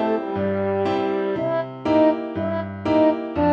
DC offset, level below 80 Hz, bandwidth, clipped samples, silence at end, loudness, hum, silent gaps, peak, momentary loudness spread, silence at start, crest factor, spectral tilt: under 0.1%; -52 dBFS; 7 kHz; under 0.1%; 0 s; -22 LUFS; none; none; -8 dBFS; 7 LU; 0 s; 14 dB; -8.5 dB/octave